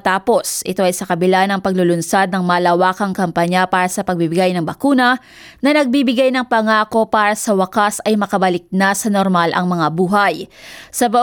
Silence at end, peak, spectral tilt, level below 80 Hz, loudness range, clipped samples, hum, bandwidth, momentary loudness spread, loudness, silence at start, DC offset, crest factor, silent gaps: 0 s; -2 dBFS; -4.5 dB/octave; -54 dBFS; 1 LU; under 0.1%; none; 19 kHz; 4 LU; -15 LUFS; 0.05 s; under 0.1%; 14 dB; none